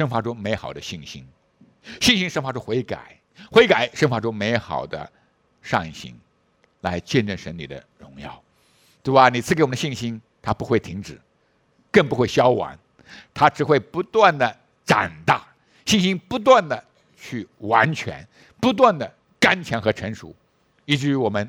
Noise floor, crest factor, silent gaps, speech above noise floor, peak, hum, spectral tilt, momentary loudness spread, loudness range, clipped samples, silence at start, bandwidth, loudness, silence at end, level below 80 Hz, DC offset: -64 dBFS; 22 dB; none; 43 dB; 0 dBFS; none; -5 dB/octave; 19 LU; 7 LU; under 0.1%; 0 s; 17 kHz; -20 LUFS; 0 s; -54 dBFS; under 0.1%